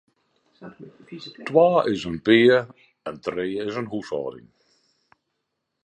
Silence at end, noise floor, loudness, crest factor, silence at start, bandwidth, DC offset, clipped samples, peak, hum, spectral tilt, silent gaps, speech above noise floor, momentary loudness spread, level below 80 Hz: 1.45 s; -79 dBFS; -21 LUFS; 20 dB; 0.6 s; 8.8 kHz; under 0.1%; under 0.1%; -4 dBFS; none; -6.5 dB/octave; none; 56 dB; 24 LU; -60 dBFS